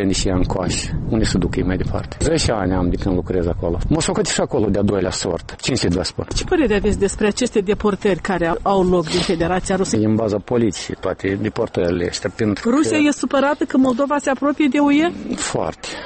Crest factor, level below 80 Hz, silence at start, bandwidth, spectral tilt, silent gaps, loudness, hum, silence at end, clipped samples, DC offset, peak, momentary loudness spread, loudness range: 12 dB; -32 dBFS; 0 s; 8.8 kHz; -5 dB/octave; none; -19 LUFS; none; 0 s; under 0.1%; under 0.1%; -6 dBFS; 6 LU; 2 LU